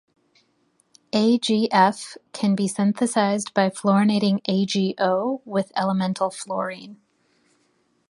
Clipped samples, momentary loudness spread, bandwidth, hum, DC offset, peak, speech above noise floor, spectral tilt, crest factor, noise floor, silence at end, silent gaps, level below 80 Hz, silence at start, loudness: under 0.1%; 9 LU; 11.5 kHz; none; under 0.1%; -2 dBFS; 45 dB; -5.5 dB/octave; 20 dB; -66 dBFS; 1.15 s; none; -68 dBFS; 1.15 s; -22 LUFS